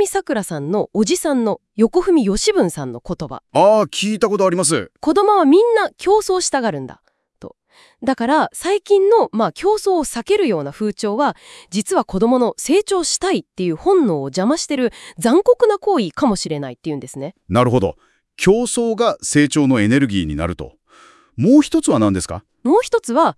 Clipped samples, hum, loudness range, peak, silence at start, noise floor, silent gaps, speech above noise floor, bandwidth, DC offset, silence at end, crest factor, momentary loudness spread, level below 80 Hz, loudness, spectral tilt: under 0.1%; none; 3 LU; 0 dBFS; 0 s; -48 dBFS; none; 32 dB; 12 kHz; under 0.1%; 0.05 s; 16 dB; 11 LU; -46 dBFS; -17 LUFS; -5 dB/octave